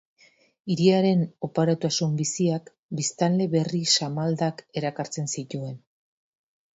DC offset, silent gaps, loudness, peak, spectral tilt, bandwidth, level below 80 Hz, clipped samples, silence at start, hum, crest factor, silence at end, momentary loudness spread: under 0.1%; 2.79-2.89 s; -25 LUFS; -6 dBFS; -5 dB/octave; 8 kHz; -68 dBFS; under 0.1%; 0.65 s; none; 20 dB; 0.95 s; 12 LU